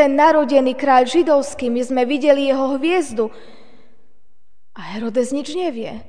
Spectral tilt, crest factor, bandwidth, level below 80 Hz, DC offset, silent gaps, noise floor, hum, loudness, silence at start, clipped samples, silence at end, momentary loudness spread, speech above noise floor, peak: -4 dB/octave; 16 dB; 10 kHz; -58 dBFS; 2%; none; -67 dBFS; none; -17 LUFS; 0 s; under 0.1%; 0.05 s; 11 LU; 50 dB; 0 dBFS